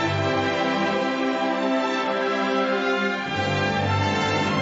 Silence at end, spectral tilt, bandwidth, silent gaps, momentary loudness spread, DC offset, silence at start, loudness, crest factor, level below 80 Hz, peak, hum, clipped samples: 0 s; -5.5 dB/octave; 8 kHz; none; 2 LU; under 0.1%; 0 s; -23 LUFS; 12 dB; -58 dBFS; -10 dBFS; none; under 0.1%